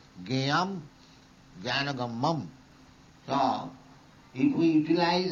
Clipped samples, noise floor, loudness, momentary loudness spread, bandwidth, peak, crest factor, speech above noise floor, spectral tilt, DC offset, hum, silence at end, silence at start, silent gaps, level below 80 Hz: under 0.1%; -55 dBFS; -28 LUFS; 18 LU; 7.4 kHz; -14 dBFS; 16 dB; 28 dB; -6 dB/octave; under 0.1%; none; 0 s; 0.15 s; none; -64 dBFS